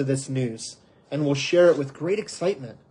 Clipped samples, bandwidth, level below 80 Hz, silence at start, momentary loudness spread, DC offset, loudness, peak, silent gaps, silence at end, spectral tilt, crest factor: under 0.1%; 10.5 kHz; -68 dBFS; 0 s; 16 LU; under 0.1%; -24 LUFS; -6 dBFS; none; 0.15 s; -5.5 dB/octave; 18 dB